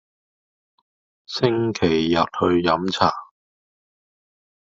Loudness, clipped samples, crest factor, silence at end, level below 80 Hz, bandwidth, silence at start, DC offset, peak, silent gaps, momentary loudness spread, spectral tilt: -20 LUFS; under 0.1%; 22 dB; 1.4 s; -56 dBFS; 7.6 kHz; 1.3 s; under 0.1%; -2 dBFS; none; 4 LU; -4 dB/octave